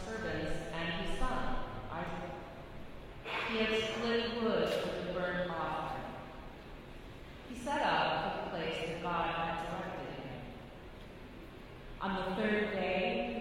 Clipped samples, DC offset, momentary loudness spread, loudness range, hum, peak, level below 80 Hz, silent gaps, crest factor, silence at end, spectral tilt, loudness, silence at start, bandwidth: under 0.1%; under 0.1%; 18 LU; 5 LU; none; -20 dBFS; -48 dBFS; none; 18 dB; 0 s; -5 dB/octave; -36 LUFS; 0 s; 15.5 kHz